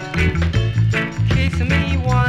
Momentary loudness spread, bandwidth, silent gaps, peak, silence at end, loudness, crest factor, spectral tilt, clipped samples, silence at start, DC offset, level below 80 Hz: 1 LU; 9.8 kHz; none; -4 dBFS; 0 s; -18 LUFS; 12 dB; -6.5 dB/octave; under 0.1%; 0 s; under 0.1%; -26 dBFS